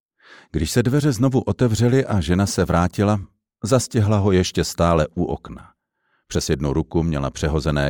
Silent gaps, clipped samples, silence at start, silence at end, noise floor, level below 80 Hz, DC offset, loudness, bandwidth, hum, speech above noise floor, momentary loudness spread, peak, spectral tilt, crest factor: none; under 0.1%; 0.55 s; 0 s; -69 dBFS; -36 dBFS; under 0.1%; -20 LUFS; 19 kHz; none; 50 dB; 8 LU; -4 dBFS; -6 dB/octave; 16 dB